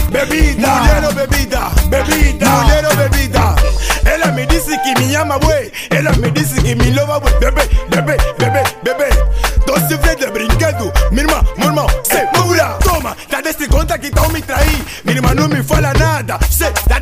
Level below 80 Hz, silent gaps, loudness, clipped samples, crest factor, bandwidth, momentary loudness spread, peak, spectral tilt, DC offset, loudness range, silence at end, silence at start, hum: -16 dBFS; none; -13 LUFS; under 0.1%; 12 dB; 16 kHz; 4 LU; 0 dBFS; -4.5 dB/octave; under 0.1%; 2 LU; 0 s; 0 s; none